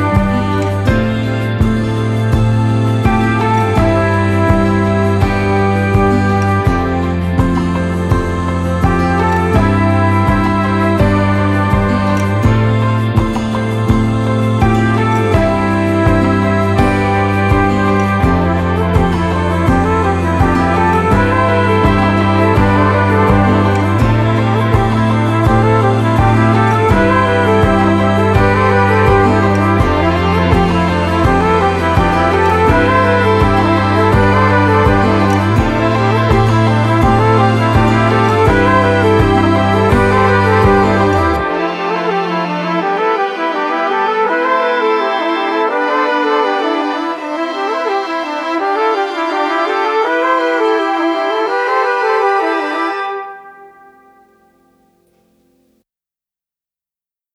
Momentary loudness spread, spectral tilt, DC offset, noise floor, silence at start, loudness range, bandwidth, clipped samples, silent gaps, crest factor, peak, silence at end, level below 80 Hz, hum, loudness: 5 LU; -7.5 dB/octave; under 0.1%; under -90 dBFS; 0 s; 4 LU; 12.5 kHz; under 0.1%; none; 12 dB; 0 dBFS; 3.65 s; -26 dBFS; none; -12 LUFS